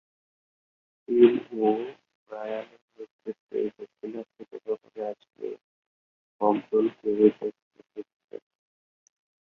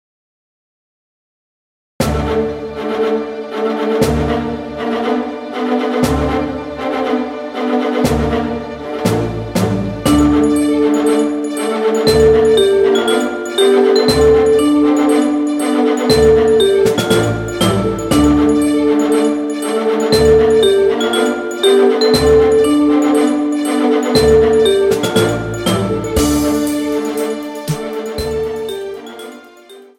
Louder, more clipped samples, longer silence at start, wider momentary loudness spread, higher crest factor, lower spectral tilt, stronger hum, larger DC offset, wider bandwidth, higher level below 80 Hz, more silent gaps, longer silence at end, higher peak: second, -27 LUFS vs -14 LUFS; neither; second, 1.1 s vs 2 s; first, 24 LU vs 11 LU; first, 24 dB vs 14 dB; first, -8.5 dB/octave vs -5.5 dB/octave; neither; neither; second, 4.3 kHz vs 17 kHz; second, -74 dBFS vs -32 dBFS; first, 2.15-2.26 s, 2.82-2.88 s, 3.11-3.19 s, 3.40-3.47 s, 5.61-6.39 s, 7.62-7.71 s, 8.14-8.28 s vs none; first, 1.1 s vs 0.15 s; second, -6 dBFS vs 0 dBFS